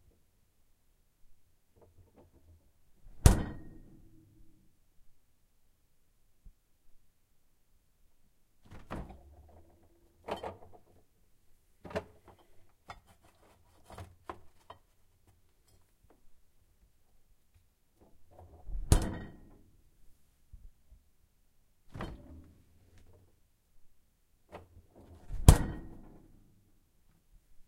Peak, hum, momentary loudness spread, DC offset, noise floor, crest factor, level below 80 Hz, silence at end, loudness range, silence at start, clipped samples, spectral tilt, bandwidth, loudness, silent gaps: 0 dBFS; none; 30 LU; under 0.1%; -69 dBFS; 38 dB; -42 dBFS; 0.05 s; 22 LU; 1.3 s; under 0.1%; -5.5 dB/octave; 16 kHz; -32 LUFS; none